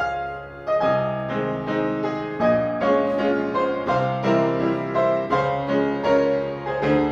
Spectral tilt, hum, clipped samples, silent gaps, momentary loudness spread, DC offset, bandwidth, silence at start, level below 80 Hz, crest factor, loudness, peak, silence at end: -7.5 dB/octave; none; under 0.1%; none; 5 LU; under 0.1%; 7.4 kHz; 0 s; -50 dBFS; 16 dB; -22 LUFS; -6 dBFS; 0 s